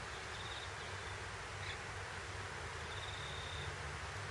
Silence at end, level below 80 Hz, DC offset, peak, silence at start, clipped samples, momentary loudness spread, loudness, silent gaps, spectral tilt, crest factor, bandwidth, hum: 0 s; -58 dBFS; under 0.1%; -32 dBFS; 0 s; under 0.1%; 2 LU; -45 LUFS; none; -3 dB/octave; 14 dB; 11.5 kHz; none